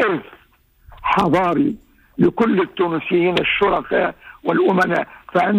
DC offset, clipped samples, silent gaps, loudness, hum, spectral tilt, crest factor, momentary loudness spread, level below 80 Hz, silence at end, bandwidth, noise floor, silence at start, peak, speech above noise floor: under 0.1%; under 0.1%; none; -18 LUFS; none; -7 dB/octave; 14 dB; 9 LU; -48 dBFS; 0 s; 15 kHz; -51 dBFS; 0 s; -4 dBFS; 34 dB